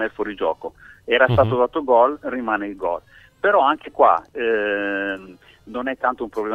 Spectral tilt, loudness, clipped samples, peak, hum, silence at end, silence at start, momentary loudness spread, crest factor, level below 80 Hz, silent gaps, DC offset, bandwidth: -7.5 dB/octave; -20 LUFS; under 0.1%; -2 dBFS; none; 0 s; 0 s; 12 LU; 18 dB; -50 dBFS; none; under 0.1%; 6.8 kHz